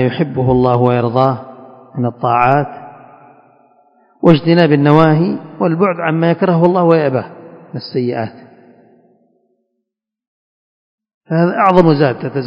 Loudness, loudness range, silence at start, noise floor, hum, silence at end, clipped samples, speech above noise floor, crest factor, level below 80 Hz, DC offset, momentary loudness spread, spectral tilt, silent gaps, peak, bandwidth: -13 LUFS; 14 LU; 0 s; -77 dBFS; none; 0 s; 0.3%; 65 dB; 14 dB; -48 dBFS; under 0.1%; 13 LU; -9.5 dB/octave; 10.27-10.98 s, 11.14-11.21 s; 0 dBFS; 5.6 kHz